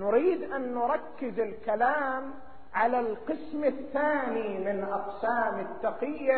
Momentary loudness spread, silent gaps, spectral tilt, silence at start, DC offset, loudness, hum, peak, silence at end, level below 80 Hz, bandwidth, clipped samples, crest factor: 8 LU; none; -4 dB/octave; 0 s; 0.7%; -30 LUFS; none; -12 dBFS; 0 s; -64 dBFS; 4.5 kHz; under 0.1%; 16 dB